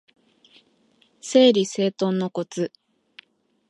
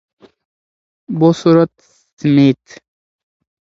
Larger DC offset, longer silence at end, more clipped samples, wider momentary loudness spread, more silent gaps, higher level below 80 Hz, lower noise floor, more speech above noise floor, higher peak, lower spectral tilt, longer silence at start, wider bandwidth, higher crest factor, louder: neither; about the same, 1 s vs 1.05 s; neither; first, 14 LU vs 11 LU; second, none vs 2.13-2.17 s; second, -78 dBFS vs -58 dBFS; second, -62 dBFS vs under -90 dBFS; second, 42 dB vs over 78 dB; second, -4 dBFS vs 0 dBFS; second, -5 dB/octave vs -8 dB/octave; first, 1.25 s vs 1.1 s; first, 11.5 kHz vs 7.8 kHz; about the same, 20 dB vs 16 dB; second, -21 LUFS vs -13 LUFS